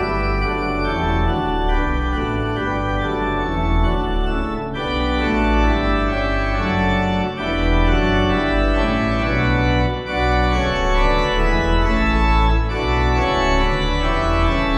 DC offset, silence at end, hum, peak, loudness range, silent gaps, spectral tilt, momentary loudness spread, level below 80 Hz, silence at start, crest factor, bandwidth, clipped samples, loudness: under 0.1%; 0 s; none; -4 dBFS; 3 LU; none; -6.5 dB/octave; 4 LU; -22 dBFS; 0 s; 14 dB; 8.4 kHz; under 0.1%; -19 LUFS